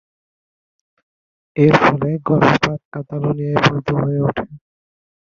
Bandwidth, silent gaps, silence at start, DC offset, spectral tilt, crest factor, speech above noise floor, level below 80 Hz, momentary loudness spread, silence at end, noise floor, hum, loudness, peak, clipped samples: 7.4 kHz; 2.85-2.92 s; 1.55 s; under 0.1%; -7 dB/octave; 18 dB; over 74 dB; -48 dBFS; 15 LU; 0.85 s; under -90 dBFS; none; -16 LUFS; 0 dBFS; under 0.1%